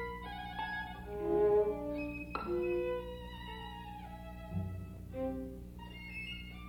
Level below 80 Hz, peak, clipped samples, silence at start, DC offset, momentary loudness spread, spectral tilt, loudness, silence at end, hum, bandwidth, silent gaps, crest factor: -52 dBFS; -20 dBFS; under 0.1%; 0 s; under 0.1%; 16 LU; -7.5 dB/octave; -38 LUFS; 0 s; 60 Hz at -50 dBFS; 18 kHz; none; 18 dB